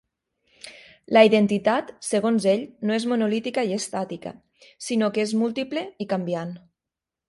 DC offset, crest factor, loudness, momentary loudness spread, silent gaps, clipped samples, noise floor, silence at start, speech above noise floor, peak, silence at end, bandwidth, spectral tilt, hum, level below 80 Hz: under 0.1%; 22 dB; -23 LUFS; 20 LU; none; under 0.1%; -88 dBFS; 0.65 s; 65 dB; -2 dBFS; 0.7 s; 11.5 kHz; -5 dB/octave; none; -68 dBFS